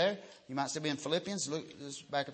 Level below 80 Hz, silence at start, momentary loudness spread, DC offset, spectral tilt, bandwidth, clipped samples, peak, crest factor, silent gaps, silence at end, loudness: -80 dBFS; 0 s; 11 LU; under 0.1%; -3.5 dB/octave; 8.8 kHz; under 0.1%; -18 dBFS; 18 dB; none; 0 s; -37 LUFS